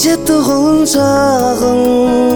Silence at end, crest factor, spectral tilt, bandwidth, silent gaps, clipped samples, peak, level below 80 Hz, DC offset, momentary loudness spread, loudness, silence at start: 0 s; 10 dB; -4.5 dB/octave; over 20 kHz; none; under 0.1%; 0 dBFS; -36 dBFS; under 0.1%; 1 LU; -11 LUFS; 0 s